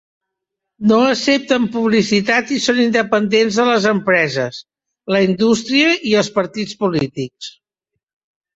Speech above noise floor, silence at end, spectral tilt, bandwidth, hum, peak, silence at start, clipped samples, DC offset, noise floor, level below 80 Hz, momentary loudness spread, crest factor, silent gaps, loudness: 64 dB; 1.05 s; -4.5 dB/octave; 8 kHz; none; -2 dBFS; 0.8 s; under 0.1%; under 0.1%; -80 dBFS; -56 dBFS; 10 LU; 14 dB; none; -15 LUFS